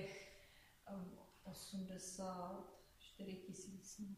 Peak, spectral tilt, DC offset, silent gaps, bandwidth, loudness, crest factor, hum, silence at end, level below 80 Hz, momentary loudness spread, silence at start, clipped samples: -36 dBFS; -4.5 dB/octave; under 0.1%; none; 15.5 kHz; -53 LUFS; 16 dB; none; 0 s; -74 dBFS; 15 LU; 0 s; under 0.1%